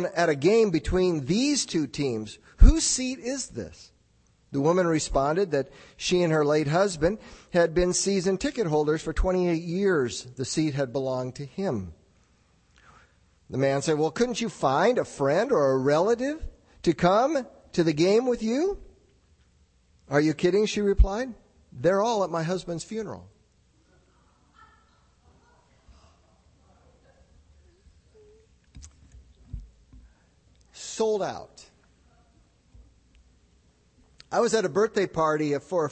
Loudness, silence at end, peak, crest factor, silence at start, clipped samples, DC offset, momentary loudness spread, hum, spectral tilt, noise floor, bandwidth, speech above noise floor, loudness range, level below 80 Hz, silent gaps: -25 LUFS; 0 s; -4 dBFS; 24 dB; 0 s; under 0.1%; under 0.1%; 13 LU; none; -5 dB/octave; -63 dBFS; 8.8 kHz; 39 dB; 10 LU; -34 dBFS; none